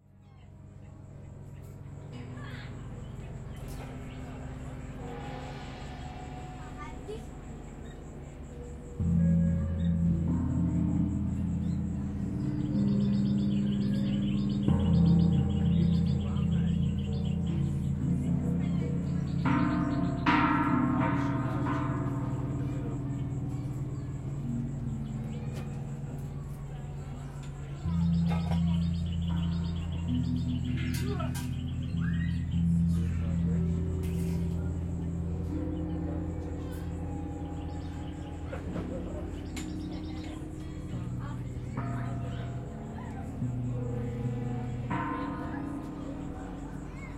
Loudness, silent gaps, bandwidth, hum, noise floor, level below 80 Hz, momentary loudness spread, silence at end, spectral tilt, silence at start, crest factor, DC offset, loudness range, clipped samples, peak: -32 LUFS; none; 13 kHz; none; -53 dBFS; -46 dBFS; 15 LU; 0 s; -8 dB/octave; 0.25 s; 20 dB; under 0.1%; 14 LU; under 0.1%; -12 dBFS